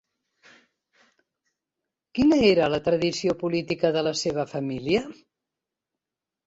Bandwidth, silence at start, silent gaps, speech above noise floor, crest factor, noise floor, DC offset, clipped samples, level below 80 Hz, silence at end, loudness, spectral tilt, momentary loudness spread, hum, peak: 8 kHz; 2.15 s; none; 65 dB; 20 dB; -88 dBFS; under 0.1%; under 0.1%; -56 dBFS; 1.35 s; -24 LUFS; -5 dB/octave; 11 LU; none; -8 dBFS